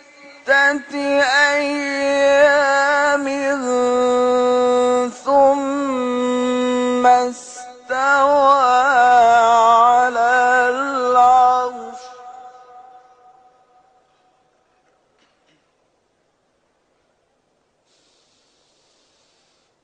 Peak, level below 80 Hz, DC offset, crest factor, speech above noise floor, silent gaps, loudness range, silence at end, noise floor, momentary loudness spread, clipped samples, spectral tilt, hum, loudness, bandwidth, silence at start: -4 dBFS; -60 dBFS; under 0.1%; 14 dB; 49 dB; none; 5 LU; 7.05 s; -65 dBFS; 9 LU; under 0.1%; -2.5 dB/octave; none; -15 LUFS; 9.6 kHz; 0.45 s